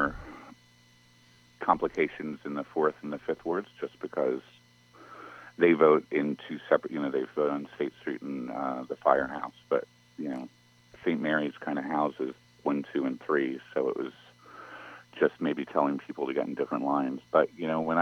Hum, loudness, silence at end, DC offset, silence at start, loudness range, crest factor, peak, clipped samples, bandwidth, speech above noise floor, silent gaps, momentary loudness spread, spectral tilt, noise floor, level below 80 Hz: 60 Hz at -60 dBFS; -30 LUFS; 0 s; under 0.1%; 0 s; 5 LU; 24 dB; -6 dBFS; under 0.1%; 9.6 kHz; 31 dB; none; 19 LU; -7 dB/octave; -60 dBFS; -64 dBFS